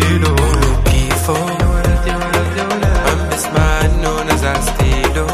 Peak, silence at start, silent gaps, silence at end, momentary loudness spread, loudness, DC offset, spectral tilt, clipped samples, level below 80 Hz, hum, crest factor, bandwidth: 0 dBFS; 0 s; none; 0 s; 3 LU; -15 LUFS; under 0.1%; -5 dB/octave; under 0.1%; -18 dBFS; none; 14 dB; 15.5 kHz